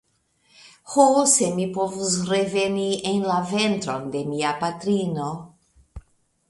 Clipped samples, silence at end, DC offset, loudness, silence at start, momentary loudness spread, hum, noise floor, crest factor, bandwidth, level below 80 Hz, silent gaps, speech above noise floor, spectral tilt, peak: under 0.1%; 0.5 s; under 0.1%; -22 LUFS; 0.65 s; 11 LU; none; -65 dBFS; 20 dB; 11.5 kHz; -56 dBFS; none; 43 dB; -4 dB/octave; -4 dBFS